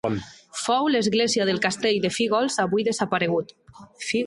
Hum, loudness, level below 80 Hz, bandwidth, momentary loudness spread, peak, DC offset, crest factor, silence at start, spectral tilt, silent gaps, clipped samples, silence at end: none; -23 LUFS; -60 dBFS; 11.5 kHz; 10 LU; -6 dBFS; under 0.1%; 16 dB; 0.05 s; -4 dB/octave; none; under 0.1%; 0 s